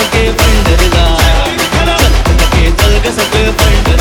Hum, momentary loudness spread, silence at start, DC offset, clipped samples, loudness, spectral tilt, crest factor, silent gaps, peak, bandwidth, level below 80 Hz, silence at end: none; 2 LU; 0 s; under 0.1%; under 0.1%; -9 LUFS; -4.5 dB/octave; 8 dB; none; 0 dBFS; 18 kHz; -12 dBFS; 0 s